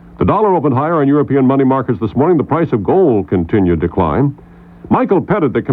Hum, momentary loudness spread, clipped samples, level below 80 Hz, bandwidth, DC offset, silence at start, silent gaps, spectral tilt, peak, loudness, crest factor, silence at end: none; 4 LU; under 0.1%; -38 dBFS; 4.1 kHz; under 0.1%; 0.15 s; none; -11.5 dB/octave; -2 dBFS; -13 LUFS; 12 dB; 0 s